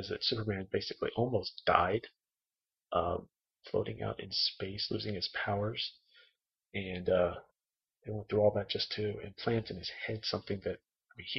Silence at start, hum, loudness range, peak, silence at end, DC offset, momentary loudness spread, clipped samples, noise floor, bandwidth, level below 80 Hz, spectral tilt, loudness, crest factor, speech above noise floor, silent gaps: 0 s; none; 2 LU; -8 dBFS; 0 s; under 0.1%; 11 LU; under 0.1%; under -90 dBFS; 6.2 kHz; -62 dBFS; -6 dB/octave; -35 LUFS; 28 dB; over 56 dB; none